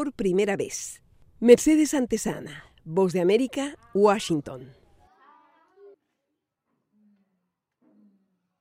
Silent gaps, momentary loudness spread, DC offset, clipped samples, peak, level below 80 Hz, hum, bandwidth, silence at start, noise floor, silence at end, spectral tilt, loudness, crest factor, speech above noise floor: none; 20 LU; under 0.1%; under 0.1%; -4 dBFS; -58 dBFS; none; 16 kHz; 0 s; -81 dBFS; 3.95 s; -5 dB/octave; -23 LUFS; 22 dB; 58 dB